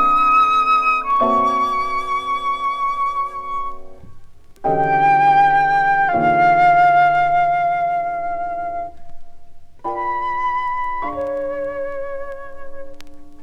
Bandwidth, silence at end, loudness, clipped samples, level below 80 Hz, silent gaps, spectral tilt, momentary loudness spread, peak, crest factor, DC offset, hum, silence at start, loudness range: 10 kHz; 0 s; -17 LUFS; under 0.1%; -42 dBFS; none; -5.5 dB/octave; 15 LU; -4 dBFS; 12 dB; under 0.1%; none; 0 s; 10 LU